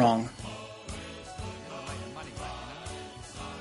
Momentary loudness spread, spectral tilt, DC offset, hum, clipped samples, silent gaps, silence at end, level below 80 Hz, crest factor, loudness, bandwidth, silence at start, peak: 7 LU; -5.5 dB/octave; under 0.1%; none; under 0.1%; none; 0 s; -52 dBFS; 24 dB; -37 LUFS; 11.5 kHz; 0 s; -10 dBFS